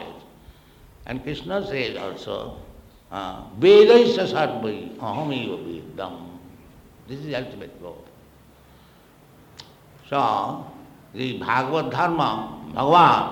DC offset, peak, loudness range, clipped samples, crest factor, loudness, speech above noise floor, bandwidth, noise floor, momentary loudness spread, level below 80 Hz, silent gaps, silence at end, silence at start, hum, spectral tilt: under 0.1%; -2 dBFS; 18 LU; under 0.1%; 20 dB; -21 LUFS; 31 dB; 16 kHz; -52 dBFS; 24 LU; -54 dBFS; none; 0 s; 0 s; none; -6 dB/octave